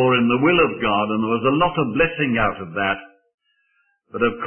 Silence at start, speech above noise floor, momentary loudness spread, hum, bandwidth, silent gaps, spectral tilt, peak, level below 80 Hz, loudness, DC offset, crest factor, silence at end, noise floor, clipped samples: 0 s; 47 dB; 7 LU; none; 3.4 kHz; 3.34-3.38 s; -11 dB/octave; -4 dBFS; -46 dBFS; -19 LUFS; under 0.1%; 16 dB; 0 s; -66 dBFS; under 0.1%